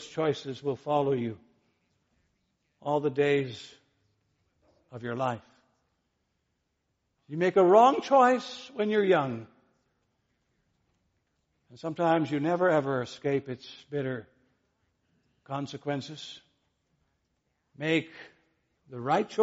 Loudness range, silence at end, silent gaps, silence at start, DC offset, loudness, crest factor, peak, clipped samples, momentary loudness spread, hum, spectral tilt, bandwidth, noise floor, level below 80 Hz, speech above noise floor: 15 LU; 0 s; none; 0 s; under 0.1%; -27 LUFS; 22 dB; -8 dBFS; under 0.1%; 19 LU; none; -4.5 dB/octave; 8 kHz; -79 dBFS; -74 dBFS; 51 dB